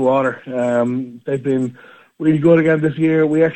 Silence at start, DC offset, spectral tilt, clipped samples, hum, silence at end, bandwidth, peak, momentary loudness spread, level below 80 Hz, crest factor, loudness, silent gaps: 0 s; under 0.1%; -8.5 dB/octave; under 0.1%; none; 0 s; 8.6 kHz; -2 dBFS; 10 LU; -60 dBFS; 14 dB; -17 LUFS; none